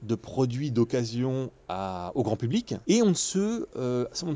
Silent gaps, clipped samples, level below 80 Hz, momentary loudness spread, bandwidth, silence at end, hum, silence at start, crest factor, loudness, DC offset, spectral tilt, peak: none; under 0.1%; -56 dBFS; 9 LU; 8 kHz; 0 s; none; 0 s; 16 dB; -28 LUFS; under 0.1%; -5.5 dB/octave; -12 dBFS